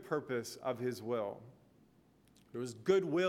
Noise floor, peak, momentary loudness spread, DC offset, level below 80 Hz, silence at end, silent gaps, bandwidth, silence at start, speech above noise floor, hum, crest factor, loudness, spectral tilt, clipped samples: -67 dBFS; -18 dBFS; 12 LU; under 0.1%; -78 dBFS; 0 s; none; 15.5 kHz; 0 s; 31 dB; none; 20 dB; -38 LUFS; -5.5 dB/octave; under 0.1%